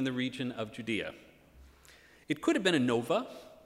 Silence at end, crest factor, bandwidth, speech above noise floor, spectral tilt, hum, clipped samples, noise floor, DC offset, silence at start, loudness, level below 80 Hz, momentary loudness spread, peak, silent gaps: 0.1 s; 20 dB; 15.5 kHz; 27 dB; -5 dB/octave; none; under 0.1%; -59 dBFS; under 0.1%; 0 s; -32 LUFS; -66 dBFS; 11 LU; -14 dBFS; none